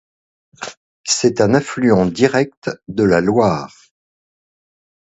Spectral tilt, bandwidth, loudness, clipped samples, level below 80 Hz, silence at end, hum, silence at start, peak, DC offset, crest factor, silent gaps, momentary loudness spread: -5 dB/octave; 8.2 kHz; -16 LUFS; under 0.1%; -48 dBFS; 1.45 s; none; 0.6 s; 0 dBFS; under 0.1%; 18 dB; 0.77-1.04 s, 2.57-2.62 s; 18 LU